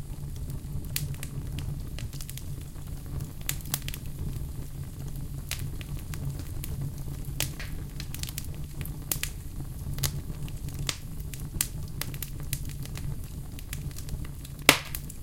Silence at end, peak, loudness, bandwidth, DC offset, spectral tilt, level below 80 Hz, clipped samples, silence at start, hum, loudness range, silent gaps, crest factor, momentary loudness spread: 0 s; 0 dBFS; -34 LUFS; 17 kHz; under 0.1%; -3.5 dB/octave; -40 dBFS; under 0.1%; 0 s; none; 3 LU; none; 34 dB; 8 LU